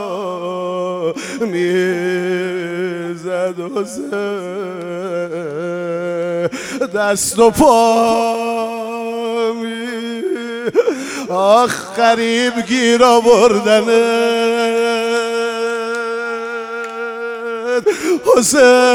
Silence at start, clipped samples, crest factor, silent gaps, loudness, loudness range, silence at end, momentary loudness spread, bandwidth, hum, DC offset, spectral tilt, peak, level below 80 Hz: 0 s; under 0.1%; 16 dB; none; -16 LUFS; 9 LU; 0 s; 13 LU; 16.5 kHz; none; under 0.1%; -3.5 dB/octave; 0 dBFS; -50 dBFS